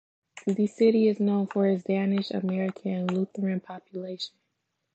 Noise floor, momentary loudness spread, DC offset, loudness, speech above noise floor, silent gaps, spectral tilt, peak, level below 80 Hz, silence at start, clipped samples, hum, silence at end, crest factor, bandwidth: -79 dBFS; 14 LU; under 0.1%; -27 LUFS; 53 dB; none; -7.5 dB/octave; -12 dBFS; -78 dBFS; 0.35 s; under 0.1%; none; 0.65 s; 16 dB; 8.2 kHz